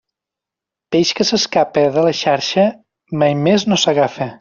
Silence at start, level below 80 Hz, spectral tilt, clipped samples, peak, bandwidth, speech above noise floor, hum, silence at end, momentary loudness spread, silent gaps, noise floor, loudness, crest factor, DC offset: 0.9 s; -56 dBFS; -4 dB/octave; under 0.1%; -2 dBFS; 7.4 kHz; 70 dB; none; 0.05 s; 4 LU; none; -85 dBFS; -15 LUFS; 14 dB; under 0.1%